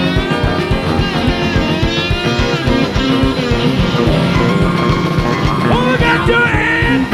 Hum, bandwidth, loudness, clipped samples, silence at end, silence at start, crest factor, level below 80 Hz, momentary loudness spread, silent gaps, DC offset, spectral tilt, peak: none; 14 kHz; -13 LUFS; under 0.1%; 0 s; 0 s; 12 dB; -24 dBFS; 3 LU; none; under 0.1%; -6 dB/octave; 0 dBFS